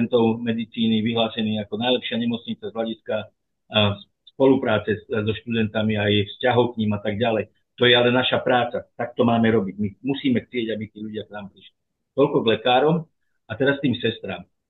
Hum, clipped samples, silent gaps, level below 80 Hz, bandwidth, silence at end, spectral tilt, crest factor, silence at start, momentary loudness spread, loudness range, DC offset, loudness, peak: none; under 0.1%; none; -62 dBFS; 4.2 kHz; 0.25 s; -9 dB/octave; 18 dB; 0 s; 12 LU; 4 LU; under 0.1%; -22 LUFS; -4 dBFS